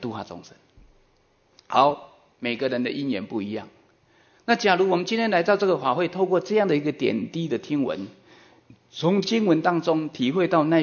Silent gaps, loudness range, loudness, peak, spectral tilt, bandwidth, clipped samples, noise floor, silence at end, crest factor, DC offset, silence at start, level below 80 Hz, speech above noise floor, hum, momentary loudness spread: none; 5 LU; -23 LUFS; -4 dBFS; -6 dB/octave; 7 kHz; under 0.1%; -63 dBFS; 0 s; 20 dB; under 0.1%; 0 s; -66 dBFS; 40 dB; none; 13 LU